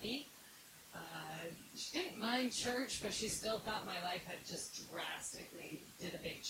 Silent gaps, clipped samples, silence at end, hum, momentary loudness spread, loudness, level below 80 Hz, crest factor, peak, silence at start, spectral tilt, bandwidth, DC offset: none; under 0.1%; 0 s; none; 13 LU; -43 LUFS; -70 dBFS; 18 dB; -26 dBFS; 0 s; -2.5 dB/octave; 16 kHz; under 0.1%